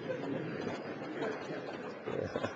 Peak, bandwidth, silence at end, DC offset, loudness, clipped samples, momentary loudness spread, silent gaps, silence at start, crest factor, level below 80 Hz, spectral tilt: -20 dBFS; 8.2 kHz; 0 s; under 0.1%; -40 LUFS; under 0.1%; 4 LU; none; 0 s; 20 dB; -72 dBFS; -6.5 dB/octave